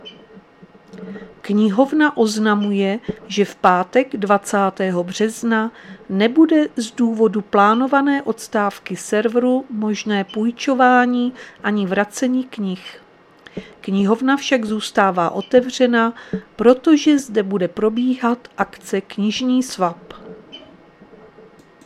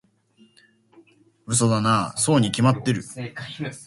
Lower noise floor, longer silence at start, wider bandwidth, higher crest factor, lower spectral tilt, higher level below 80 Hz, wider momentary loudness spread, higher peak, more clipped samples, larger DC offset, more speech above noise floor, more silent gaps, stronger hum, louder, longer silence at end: second, -46 dBFS vs -58 dBFS; second, 0.05 s vs 1.5 s; first, 14 kHz vs 11.5 kHz; about the same, 18 dB vs 20 dB; about the same, -5 dB/octave vs -5 dB/octave; about the same, -58 dBFS vs -56 dBFS; about the same, 13 LU vs 14 LU; first, 0 dBFS vs -4 dBFS; neither; neither; second, 29 dB vs 36 dB; neither; neither; first, -18 LUFS vs -22 LUFS; first, 1.25 s vs 0 s